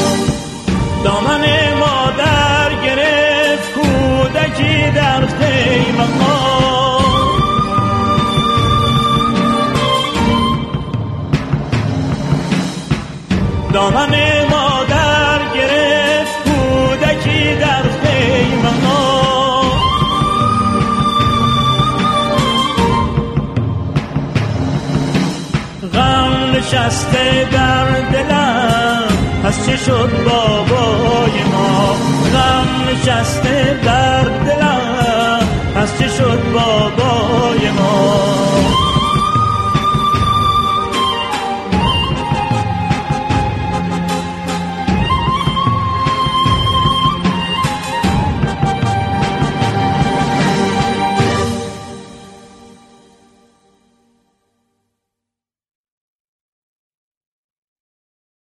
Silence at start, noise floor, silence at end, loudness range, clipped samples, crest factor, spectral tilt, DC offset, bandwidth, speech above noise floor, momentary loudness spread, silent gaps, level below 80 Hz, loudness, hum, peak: 0 s; -84 dBFS; 5.95 s; 4 LU; under 0.1%; 14 dB; -5.5 dB/octave; under 0.1%; 13 kHz; 71 dB; 6 LU; none; -30 dBFS; -14 LUFS; none; 0 dBFS